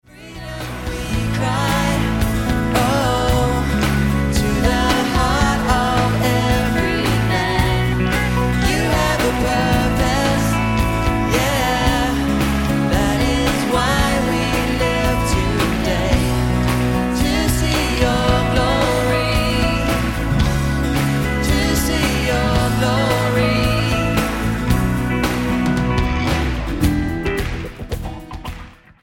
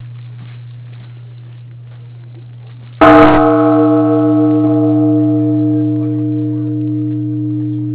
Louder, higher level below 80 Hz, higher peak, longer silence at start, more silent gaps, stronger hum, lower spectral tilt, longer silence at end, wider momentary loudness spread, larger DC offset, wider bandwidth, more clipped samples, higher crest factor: second, -18 LUFS vs -11 LUFS; first, -24 dBFS vs -40 dBFS; about the same, -2 dBFS vs 0 dBFS; first, 0.15 s vs 0 s; neither; neither; second, -5.5 dB/octave vs -12 dB/octave; first, 0.3 s vs 0 s; second, 4 LU vs 26 LU; neither; first, 17 kHz vs 4 kHz; second, under 0.1% vs 0.2%; about the same, 16 dB vs 12 dB